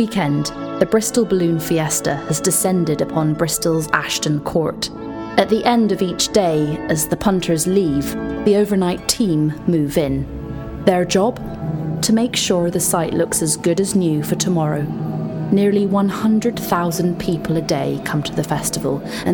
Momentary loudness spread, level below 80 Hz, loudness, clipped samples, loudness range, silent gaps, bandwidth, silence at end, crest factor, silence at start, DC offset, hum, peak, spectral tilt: 7 LU; -42 dBFS; -18 LUFS; under 0.1%; 1 LU; none; 19 kHz; 0 s; 18 dB; 0 s; under 0.1%; none; 0 dBFS; -5 dB/octave